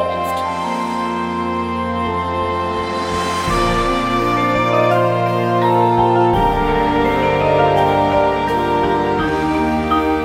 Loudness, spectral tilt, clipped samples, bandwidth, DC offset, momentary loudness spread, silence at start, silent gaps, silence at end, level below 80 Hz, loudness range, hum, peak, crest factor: -16 LUFS; -6 dB/octave; under 0.1%; 16.5 kHz; under 0.1%; 7 LU; 0 s; none; 0 s; -34 dBFS; 5 LU; none; -2 dBFS; 14 dB